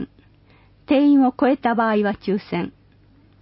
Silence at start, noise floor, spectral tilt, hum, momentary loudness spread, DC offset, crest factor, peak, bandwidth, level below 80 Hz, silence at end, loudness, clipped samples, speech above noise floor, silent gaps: 0 s; -53 dBFS; -11.5 dB/octave; none; 12 LU; under 0.1%; 14 dB; -8 dBFS; 5.8 kHz; -54 dBFS; 0.7 s; -19 LUFS; under 0.1%; 35 dB; none